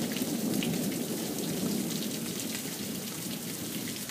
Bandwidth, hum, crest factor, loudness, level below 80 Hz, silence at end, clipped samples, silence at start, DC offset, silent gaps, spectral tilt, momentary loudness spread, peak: 16 kHz; none; 16 dB; -33 LUFS; -66 dBFS; 0 s; under 0.1%; 0 s; under 0.1%; none; -3.5 dB/octave; 5 LU; -16 dBFS